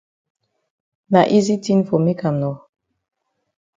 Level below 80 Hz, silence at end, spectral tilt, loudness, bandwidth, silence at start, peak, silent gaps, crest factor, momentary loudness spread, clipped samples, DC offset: -62 dBFS; 1.2 s; -7 dB/octave; -18 LUFS; 7.8 kHz; 1.1 s; 0 dBFS; none; 20 dB; 10 LU; under 0.1%; under 0.1%